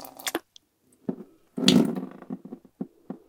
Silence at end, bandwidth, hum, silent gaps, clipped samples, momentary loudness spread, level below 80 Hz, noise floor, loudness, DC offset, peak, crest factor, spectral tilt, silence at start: 0.15 s; 18 kHz; none; none; under 0.1%; 20 LU; -70 dBFS; -64 dBFS; -26 LUFS; under 0.1%; 0 dBFS; 28 dB; -4.5 dB/octave; 0 s